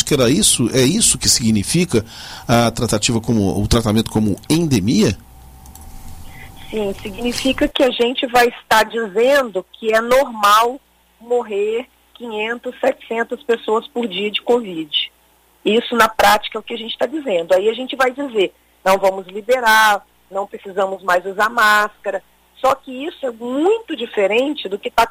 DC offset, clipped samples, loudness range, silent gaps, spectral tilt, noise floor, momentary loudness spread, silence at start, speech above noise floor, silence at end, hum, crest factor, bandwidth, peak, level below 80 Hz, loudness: under 0.1%; under 0.1%; 5 LU; none; -3.5 dB/octave; -54 dBFS; 13 LU; 0 s; 38 dB; 0 s; none; 18 dB; 16 kHz; 0 dBFS; -40 dBFS; -17 LUFS